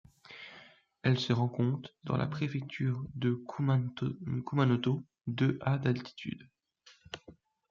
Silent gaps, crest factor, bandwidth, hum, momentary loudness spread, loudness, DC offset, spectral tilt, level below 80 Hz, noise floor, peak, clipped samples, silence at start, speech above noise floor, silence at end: none; 20 dB; 7.2 kHz; none; 18 LU; -33 LUFS; under 0.1%; -7.5 dB/octave; -66 dBFS; -63 dBFS; -14 dBFS; under 0.1%; 0.3 s; 32 dB; 0.4 s